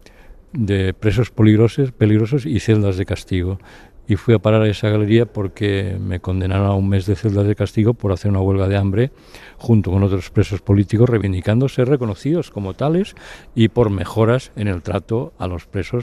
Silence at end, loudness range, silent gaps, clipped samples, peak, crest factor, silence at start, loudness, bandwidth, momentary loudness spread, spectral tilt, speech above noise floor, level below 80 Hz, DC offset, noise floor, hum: 0 s; 2 LU; none; under 0.1%; -2 dBFS; 16 dB; 0.3 s; -18 LUFS; 11 kHz; 9 LU; -8 dB/octave; 25 dB; -40 dBFS; under 0.1%; -42 dBFS; none